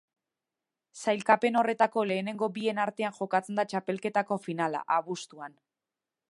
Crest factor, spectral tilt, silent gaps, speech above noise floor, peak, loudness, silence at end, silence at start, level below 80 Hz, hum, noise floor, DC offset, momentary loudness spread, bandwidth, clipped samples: 22 dB; -5 dB/octave; none; 61 dB; -8 dBFS; -29 LUFS; 0.85 s; 0.95 s; -82 dBFS; none; -90 dBFS; under 0.1%; 11 LU; 11.5 kHz; under 0.1%